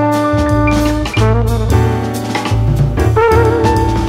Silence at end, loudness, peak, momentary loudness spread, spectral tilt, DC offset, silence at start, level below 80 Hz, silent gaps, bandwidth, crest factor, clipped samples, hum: 0 s; -13 LUFS; 0 dBFS; 5 LU; -7 dB/octave; under 0.1%; 0 s; -20 dBFS; none; 15.5 kHz; 12 dB; under 0.1%; none